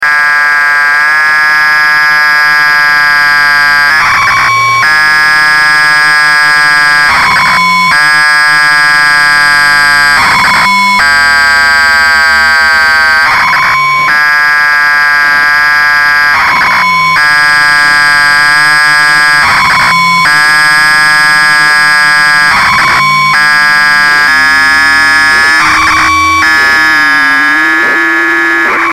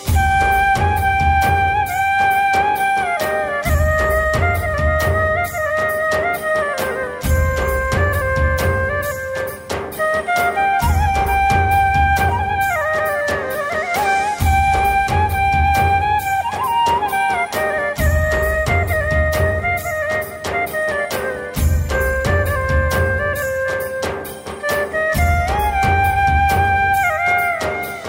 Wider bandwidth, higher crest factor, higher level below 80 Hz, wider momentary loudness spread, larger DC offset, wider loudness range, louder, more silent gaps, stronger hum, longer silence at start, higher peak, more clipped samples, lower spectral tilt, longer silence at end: about the same, 17 kHz vs 16.5 kHz; second, 6 dB vs 12 dB; second, -38 dBFS vs -26 dBFS; second, 2 LU vs 6 LU; first, 0.4% vs under 0.1%; about the same, 1 LU vs 3 LU; first, -4 LUFS vs -17 LUFS; neither; neither; about the same, 0 s vs 0 s; first, 0 dBFS vs -6 dBFS; neither; second, -1 dB/octave vs -5 dB/octave; about the same, 0 s vs 0 s